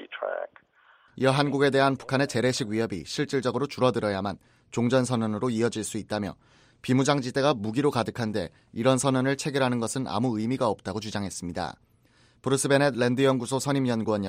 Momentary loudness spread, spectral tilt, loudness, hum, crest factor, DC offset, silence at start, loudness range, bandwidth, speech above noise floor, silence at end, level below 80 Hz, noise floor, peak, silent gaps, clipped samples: 10 LU; -5 dB/octave; -26 LUFS; none; 20 dB; under 0.1%; 0 s; 2 LU; 16 kHz; 35 dB; 0 s; -62 dBFS; -61 dBFS; -8 dBFS; none; under 0.1%